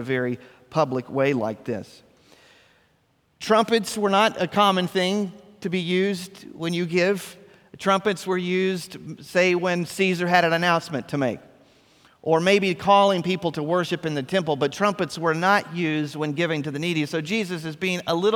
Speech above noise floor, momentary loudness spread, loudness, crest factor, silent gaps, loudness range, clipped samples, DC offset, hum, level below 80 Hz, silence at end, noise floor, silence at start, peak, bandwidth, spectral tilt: 42 dB; 11 LU; -23 LUFS; 20 dB; none; 4 LU; under 0.1%; under 0.1%; none; -66 dBFS; 0 s; -65 dBFS; 0 s; -4 dBFS; 18 kHz; -5 dB/octave